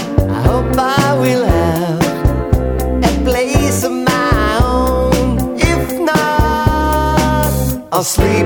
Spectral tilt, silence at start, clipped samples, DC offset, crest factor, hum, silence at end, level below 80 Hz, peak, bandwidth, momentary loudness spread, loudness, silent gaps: -5.5 dB/octave; 0 s; under 0.1%; under 0.1%; 14 dB; none; 0 s; -20 dBFS; 0 dBFS; over 20 kHz; 3 LU; -14 LUFS; none